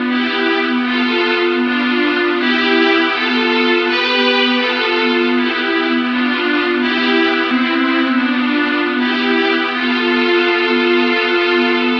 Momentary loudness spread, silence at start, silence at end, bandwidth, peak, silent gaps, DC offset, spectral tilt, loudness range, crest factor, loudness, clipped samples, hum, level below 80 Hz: 3 LU; 0 s; 0 s; 6.6 kHz; -2 dBFS; none; under 0.1%; -4 dB/octave; 1 LU; 14 dB; -14 LUFS; under 0.1%; none; -56 dBFS